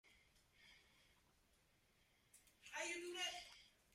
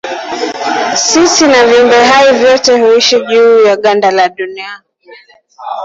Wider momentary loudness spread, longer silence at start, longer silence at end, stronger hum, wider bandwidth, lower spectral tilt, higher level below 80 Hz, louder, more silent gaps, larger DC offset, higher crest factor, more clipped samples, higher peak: first, 23 LU vs 14 LU; about the same, 0.05 s vs 0.05 s; first, 0.25 s vs 0 s; neither; first, 15.5 kHz vs 7.8 kHz; about the same, -0.5 dB/octave vs -1.5 dB/octave; second, -84 dBFS vs -50 dBFS; second, -48 LUFS vs -7 LUFS; neither; neither; first, 22 dB vs 8 dB; neither; second, -34 dBFS vs 0 dBFS